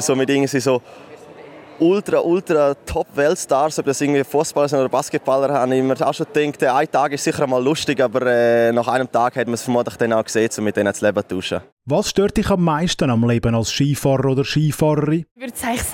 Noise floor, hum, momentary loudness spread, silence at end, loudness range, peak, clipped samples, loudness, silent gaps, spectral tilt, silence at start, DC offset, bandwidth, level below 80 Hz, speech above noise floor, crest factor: -40 dBFS; none; 5 LU; 0 s; 2 LU; -4 dBFS; under 0.1%; -18 LUFS; 11.72-11.77 s, 15.31-15.35 s; -5 dB/octave; 0 s; under 0.1%; 16.5 kHz; -44 dBFS; 22 dB; 14 dB